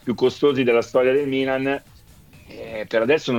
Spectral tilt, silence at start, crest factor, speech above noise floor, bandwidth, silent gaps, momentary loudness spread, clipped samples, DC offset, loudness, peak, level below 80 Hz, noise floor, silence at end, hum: -6 dB/octave; 0.05 s; 14 dB; 28 dB; 16.5 kHz; none; 13 LU; under 0.1%; under 0.1%; -20 LUFS; -6 dBFS; -54 dBFS; -48 dBFS; 0 s; none